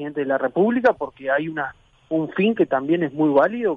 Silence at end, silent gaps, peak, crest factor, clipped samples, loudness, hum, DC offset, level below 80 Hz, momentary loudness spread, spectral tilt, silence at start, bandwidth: 0 s; none; -6 dBFS; 14 dB; under 0.1%; -21 LUFS; none; under 0.1%; -62 dBFS; 10 LU; -8.5 dB/octave; 0 s; 6.8 kHz